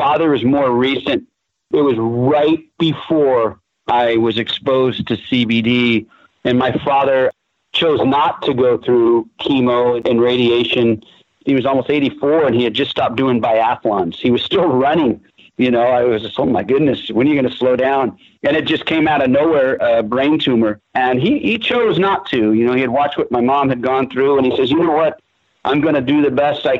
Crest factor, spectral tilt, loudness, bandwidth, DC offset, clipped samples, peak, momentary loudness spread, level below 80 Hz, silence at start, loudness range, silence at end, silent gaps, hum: 12 dB; -7.5 dB/octave; -15 LUFS; 7.4 kHz; under 0.1%; under 0.1%; -2 dBFS; 5 LU; -52 dBFS; 0 s; 1 LU; 0 s; none; none